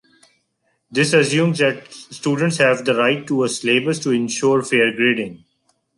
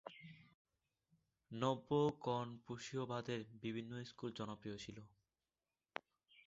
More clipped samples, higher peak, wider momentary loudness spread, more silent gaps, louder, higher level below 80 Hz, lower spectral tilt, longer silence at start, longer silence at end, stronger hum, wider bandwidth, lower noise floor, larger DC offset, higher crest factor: neither; first, -2 dBFS vs -22 dBFS; second, 9 LU vs 16 LU; second, none vs 0.54-0.65 s; first, -18 LUFS vs -45 LUFS; first, -64 dBFS vs -78 dBFS; about the same, -4.5 dB/octave vs -5.5 dB/octave; first, 0.9 s vs 0.05 s; second, 0.6 s vs 1.4 s; neither; first, 11.5 kHz vs 7.6 kHz; second, -68 dBFS vs under -90 dBFS; neither; second, 16 dB vs 24 dB